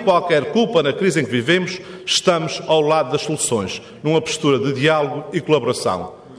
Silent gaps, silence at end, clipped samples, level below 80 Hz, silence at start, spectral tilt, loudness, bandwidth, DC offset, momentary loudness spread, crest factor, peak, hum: none; 0 s; under 0.1%; -58 dBFS; 0 s; -4 dB/octave; -18 LUFS; 11 kHz; under 0.1%; 7 LU; 16 dB; -2 dBFS; none